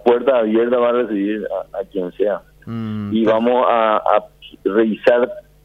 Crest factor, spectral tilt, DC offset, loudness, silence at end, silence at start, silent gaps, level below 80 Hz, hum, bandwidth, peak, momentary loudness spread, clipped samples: 16 dB; -8 dB/octave; under 0.1%; -18 LUFS; 0.25 s; 0.05 s; none; -54 dBFS; none; 5.8 kHz; 0 dBFS; 11 LU; under 0.1%